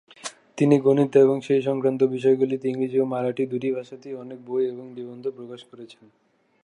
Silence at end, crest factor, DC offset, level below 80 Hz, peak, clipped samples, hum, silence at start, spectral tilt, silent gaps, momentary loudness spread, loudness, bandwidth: 0.75 s; 18 dB; under 0.1%; -76 dBFS; -6 dBFS; under 0.1%; none; 0.25 s; -7.5 dB/octave; none; 19 LU; -22 LUFS; 10.5 kHz